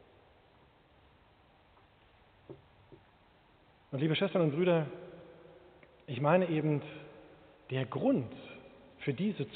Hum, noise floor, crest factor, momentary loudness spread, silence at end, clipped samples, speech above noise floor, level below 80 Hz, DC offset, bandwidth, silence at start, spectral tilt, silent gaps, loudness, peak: none; -64 dBFS; 22 dB; 26 LU; 0 s; under 0.1%; 33 dB; -72 dBFS; under 0.1%; 4.5 kHz; 2.5 s; -6 dB/octave; none; -32 LUFS; -14 dBFS